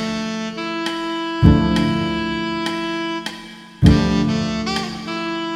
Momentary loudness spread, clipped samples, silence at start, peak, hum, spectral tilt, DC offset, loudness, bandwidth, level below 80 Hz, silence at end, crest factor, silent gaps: 11 LU; under 0.1%; 0 s; 0 dBFS; none; -6 dB/octave; under 0.1%; -19 LUFS; 13 kHz; -30 dBFS; 0 s; 20 dB; none